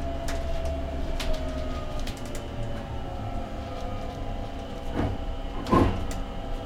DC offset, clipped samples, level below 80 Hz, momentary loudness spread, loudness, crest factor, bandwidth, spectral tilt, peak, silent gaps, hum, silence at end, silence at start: under 0.1%; under 0.1%; -32 dBFS; 11 LU; -32 LUFS; 20 dB; 14.5 kHz; -6.5 dB/octave; -8 dBFS; none; none; 0 s; 0 s